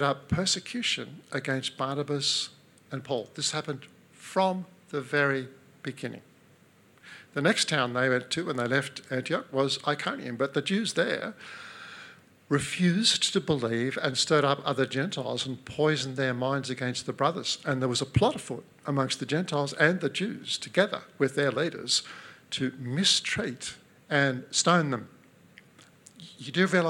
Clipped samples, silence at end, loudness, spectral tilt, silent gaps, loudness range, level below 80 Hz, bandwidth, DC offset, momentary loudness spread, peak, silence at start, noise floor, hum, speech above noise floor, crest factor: under 0.1%; 0 s; -28 LUFS; -4 dB/octave; none; 4 LU; -62 dBFS; 16.5 kHz; under 0.1%; 14 LU; -6 dBFS; 0 s; -59 dBFS; none; 31 dB; 22 dB